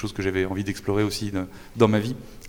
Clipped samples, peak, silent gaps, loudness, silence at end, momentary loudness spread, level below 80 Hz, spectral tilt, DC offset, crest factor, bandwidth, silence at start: under 0.1%; -4 dBFS; none; -25 LUFS; 0 s; 11 LU; -46 dBFS; -6 dB/octave; under 0.1%; 20 dB; 18.5 kHz; 0 s